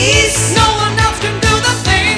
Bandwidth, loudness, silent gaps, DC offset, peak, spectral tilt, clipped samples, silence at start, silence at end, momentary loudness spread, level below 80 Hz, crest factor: 11 kHz; -11 LUFS; none; under 0.1%; 0 dBFS; -3 dB/octave; under 0.1%; 0 s; 0 s; 4 LU; -24 dBFS; 12 dB